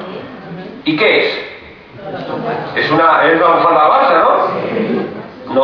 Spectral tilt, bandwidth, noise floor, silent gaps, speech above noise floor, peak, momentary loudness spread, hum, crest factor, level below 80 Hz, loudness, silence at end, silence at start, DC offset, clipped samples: -7 dB/octave; 5.4 kHz; -34 dBFS; none; 23 dB; 0 dBFS; 19 LU; none; 14 dB; -54 dBFS; -12 LUFS; 0 s; 0 s; under 0.1%; under 0.1%